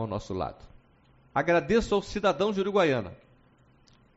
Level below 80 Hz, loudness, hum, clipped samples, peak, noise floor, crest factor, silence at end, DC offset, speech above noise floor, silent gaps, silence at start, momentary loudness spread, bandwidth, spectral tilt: -50 dBFS; -27 LUFS; none; under 0.1%; -10 dBFS; -61 dBFS; 18 dB; 1 s; under 0.1%; 34 dB; none; 0 s; 10 LU; 8 kHz; -4.5 dB/octave